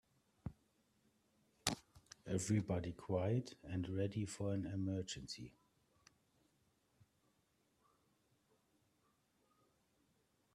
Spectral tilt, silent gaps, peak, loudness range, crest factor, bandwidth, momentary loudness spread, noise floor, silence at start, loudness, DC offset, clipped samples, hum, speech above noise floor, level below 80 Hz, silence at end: -5.5 dB/octave; none; -16 dBFS; 9 LU; 30 dB; 13.5 kHz; 16 LU; -80 dBFS; 0.45 s; -43 LUFS; under 0.1%; under 0.1%; none; 39 dB; -70 dBFS; 5.05 s